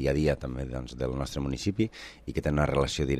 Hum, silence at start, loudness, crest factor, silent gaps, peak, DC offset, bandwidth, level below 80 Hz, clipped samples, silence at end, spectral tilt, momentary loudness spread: none; 0 s; -30 LUFS; 16 dB; none; -12 dBFS; under 0.1%; 14 kHz; -40 dBFS; under 0.1%; 0 s; -6 dB/octave; 9 LU